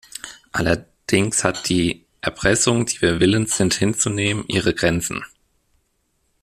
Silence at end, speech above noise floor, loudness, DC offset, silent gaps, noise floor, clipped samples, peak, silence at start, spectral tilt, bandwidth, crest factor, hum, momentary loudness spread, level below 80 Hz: 1.15 s; 48 dB; -20 LUFS; under 0.1%; none; -68 dBFS; under 0.1%; 0 dBFS; 0.25 s; -4 dB/octave; 15 kHz; 20 dB; none; 10 LU; -46 dBFS